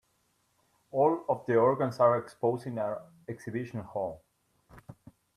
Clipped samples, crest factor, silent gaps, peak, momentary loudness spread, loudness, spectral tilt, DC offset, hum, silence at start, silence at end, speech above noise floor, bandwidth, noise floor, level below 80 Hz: under 0.1%; 20 dB; none; -12 dBFS; 13 LU; -30 LUFS; -8 dB/octave; under 0.1%; none; 0.95 s; 0.45 s; 44 dB; 13 kHz; -73 dBFS; -70 dBFS